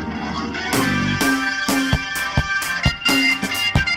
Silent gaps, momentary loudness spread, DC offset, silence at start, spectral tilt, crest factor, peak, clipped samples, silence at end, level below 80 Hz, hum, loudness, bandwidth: none; 7 LU; under 0.1%; 0 s; -3.5 dB/octave; 16 dB; -4 dBFS; under 0.1%; 0 s; -34 dBFS; none; -19 LUFS; over 20 kHz